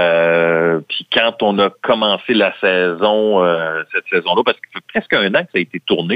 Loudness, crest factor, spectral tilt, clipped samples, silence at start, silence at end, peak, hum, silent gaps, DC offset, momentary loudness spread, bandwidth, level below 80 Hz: -15 LUFS; 14 dB; -7 dB/octave; under 0.1%; 0 s; 0 s; 0 dBFS; none; none; under 0.1%; 6 LU; 5 kHz; -60 dBFS